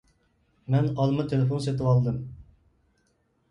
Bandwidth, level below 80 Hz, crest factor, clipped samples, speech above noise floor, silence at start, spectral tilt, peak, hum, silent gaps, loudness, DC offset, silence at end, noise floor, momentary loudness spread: 11 kHz; -54 dBFS; 16 dB; under 0.1%; 45 dB; 0.7 s; -8.5 dB/octave; -10 dBFS; none; none; -26 LUFS; under 0.1%; 1.1 s; -70 dBFS; 12 LU